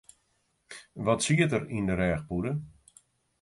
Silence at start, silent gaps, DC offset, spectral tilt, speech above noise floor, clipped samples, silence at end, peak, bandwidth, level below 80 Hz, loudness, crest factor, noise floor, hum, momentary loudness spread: 0.7 s; none; under 0.1%; -5.5 dB/octave; 46 dB; under 0.1%; 0.7 s; -12 dBFS; 11.5 kHz; -50 dBFS; -28 LUFS; 20 dB; -73 dBFS; none; 22 LU